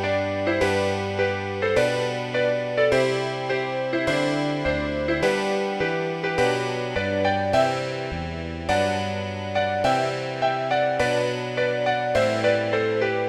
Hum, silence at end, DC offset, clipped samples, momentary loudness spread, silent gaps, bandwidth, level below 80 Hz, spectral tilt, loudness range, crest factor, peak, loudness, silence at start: none; 0 s; under 0.1%; under 0.1%; 5 LU; none; 12.5 kHz; -46 dBFS; -5 dB/octave; 1 LU; 16 dB; -8 dBFS; -23 LUFS; 0 s